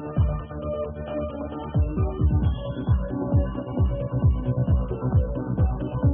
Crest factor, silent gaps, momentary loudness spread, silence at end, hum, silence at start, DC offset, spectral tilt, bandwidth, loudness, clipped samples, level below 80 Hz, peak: 14 dB; none; 7 LU; 0 s; none; 0 s; under 0.1%; -13.5 dB/octave; 3.6 kHz; -26 LUFS; under 0.1%; -30 dBFS; -10 dBFS